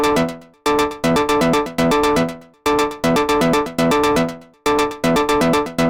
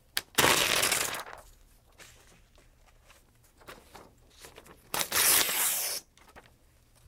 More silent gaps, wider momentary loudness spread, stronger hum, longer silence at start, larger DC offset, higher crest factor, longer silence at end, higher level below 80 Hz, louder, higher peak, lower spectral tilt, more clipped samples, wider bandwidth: neither; second, 6 LU vs 16 LU; neither; second, 0 s vs 0.15 s; neither; second, 10 dB vs 32 dB; second, 0 s vs 0.65 s; first, -40 dBFS vs -60 dBFS; first, -17 LUFS vs -26 LUFS; second, -6 dBFS vs -2 dBFS; first, -4.5 dB/octave vs -0.5 dB/octave; neither; about the same, 19 kHz vs 18 kHz